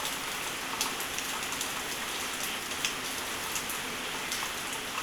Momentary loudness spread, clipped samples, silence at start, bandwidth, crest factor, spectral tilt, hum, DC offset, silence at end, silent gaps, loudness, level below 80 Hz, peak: 2 LU; under 0.1%; 0 s; over 20 kHz; 22 dB; -0.5 dB/octave; none; under 0.1%; 0 s; none; -32 LUFS; -58 dBFS; -12 dBFS